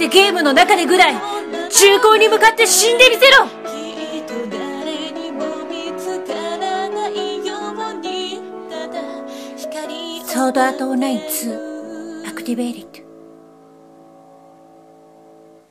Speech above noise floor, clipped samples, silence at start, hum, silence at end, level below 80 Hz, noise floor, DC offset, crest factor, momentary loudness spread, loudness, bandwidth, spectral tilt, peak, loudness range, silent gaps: 33 dB; under 0.1%; 0 s; none; 2.6 s; -58 dBFS; -45 dBFS; under 0.1%; 18 dB; 19 LU; -15 LUFS; 16 kHz; -0.5 dB/octave; 0 dBFS; 17 LU; none